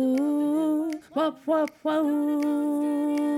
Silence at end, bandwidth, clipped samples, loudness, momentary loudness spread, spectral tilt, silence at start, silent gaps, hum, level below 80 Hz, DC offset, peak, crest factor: 0 s; 14.5 kHz; under 0.1%; -26 LUFS; 3 LU; -5 dB/octave; 0 s; none; none; -78 dBFS; under 0.1%; -14 dBFS; 10 dB